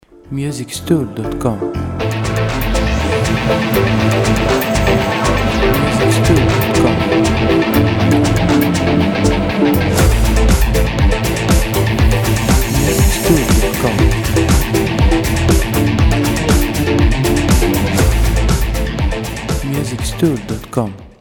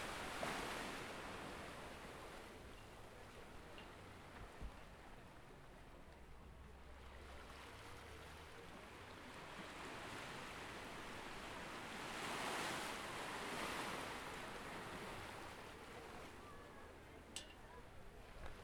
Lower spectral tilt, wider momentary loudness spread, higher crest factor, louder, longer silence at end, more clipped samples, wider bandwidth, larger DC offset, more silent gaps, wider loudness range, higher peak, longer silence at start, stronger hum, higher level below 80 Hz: first, -5.5 dB/octave vs -3 dB/octave; second, 7 LU vs 15 LU; about the same, 14 dB vs 18 dB; first, -14 LUFS vs -51 LUFS; about the same, 0.1 s vs 0 s; neither; about the same, 18.5 kHz vs over 20 kHz; neither; neither; second, 3 LU vs 12 LU; first, 0 dBFS vs -32 dBFS; first, 0.3 s vs 0 s; neither; first, -20 dBFS vs -64 dBFS